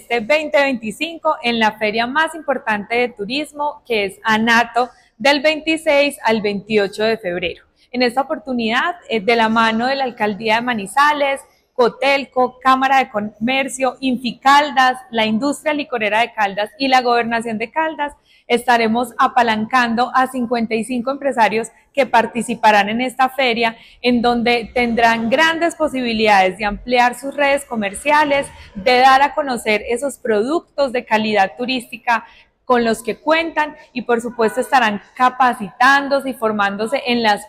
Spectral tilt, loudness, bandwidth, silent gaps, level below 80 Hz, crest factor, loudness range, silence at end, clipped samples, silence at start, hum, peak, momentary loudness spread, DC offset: -3.5 dB/octave; -17 LUFS; 16 kHz; none; -50 dBFS; 14 dB; 3 LU; 0 s; under 0.1%; 0.1 s; none; -4 dBFS; 8 LU; under 0.1%